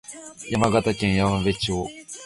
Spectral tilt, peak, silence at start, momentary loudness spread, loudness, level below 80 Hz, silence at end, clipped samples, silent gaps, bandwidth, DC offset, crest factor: -5.5 dB/octave; -4 dBFS; 0.1 s; 14 LU; -23 LUFS; -42 dBFS; 0 s; under 0.1%; none; 11.5 kHz; under 0.1%; 20 dB